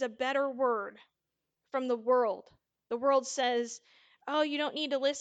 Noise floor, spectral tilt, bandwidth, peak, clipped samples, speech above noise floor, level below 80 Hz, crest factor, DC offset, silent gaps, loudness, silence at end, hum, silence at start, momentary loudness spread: -86 dBFS; -2 dB/octave; 9.2 kHz; -16 dBFS; under 0.1%; 55 dB; -84 dBFS; 18 dB; under 0.1%; none; -31 LUFS; 0 s; none; 0 s; 12 LU